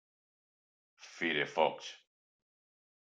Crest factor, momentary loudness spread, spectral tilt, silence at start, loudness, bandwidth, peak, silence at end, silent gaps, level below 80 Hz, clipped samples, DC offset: 26 dB; 17 LU; -3.5 dB/octave; 1 s; -33 LUFS; 9 kHz; -14 dBFS; 1.15 s; none; -88 dBFS; under 0.1%; under 0.1%